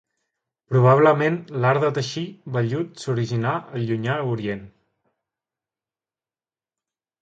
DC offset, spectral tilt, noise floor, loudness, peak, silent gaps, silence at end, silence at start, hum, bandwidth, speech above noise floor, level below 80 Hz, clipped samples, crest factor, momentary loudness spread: under 0.1%; -7 dB/octave; under -90 dBFS; -22 LUFS; -4 dBFS; none; 2.55 s; 0.7 s; none; 8 kHz; over 69 dB; -62 dBFS; under 0.1%; 20 dB; 12 LU